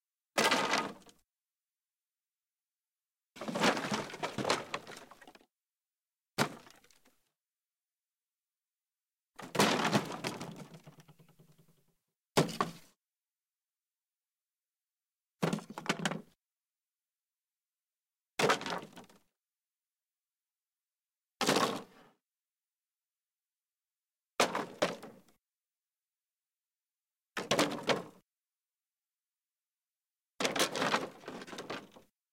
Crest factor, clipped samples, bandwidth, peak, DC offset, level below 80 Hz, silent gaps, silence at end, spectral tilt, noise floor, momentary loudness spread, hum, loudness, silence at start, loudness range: 24 dB; under 0.1%; 16.5 kHz; -14 dBFS; under 0.1%; -78 dBFS; none; 0.45 s; -3.5 dB/octave; under -90 dBFS; 16 LU; none; -34 LUFS; 0.35 s; 5 LU